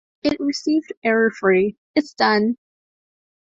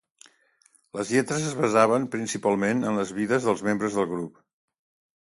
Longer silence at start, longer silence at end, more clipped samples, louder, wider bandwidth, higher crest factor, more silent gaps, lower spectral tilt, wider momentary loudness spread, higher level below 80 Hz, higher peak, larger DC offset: second, 0.25 s vs 0.95 s; about the same, 0.95 s vs 0.95 s; neither; first, -20 LUFS vs -25 LUFS; second, 7.8 kHz vs 11.5 kHz; about the same, 18 dB vs 22 dB; first, 0.97-1.02 s, 1.77-1.94 s vs none; about the same, -5 dB/octave vs -5 dB/octave; second, 6 LU vs 10 LU; first, -60 dBFS vs -66 dBFS; about the same, -2 dBFS vs -4 dBFS; neither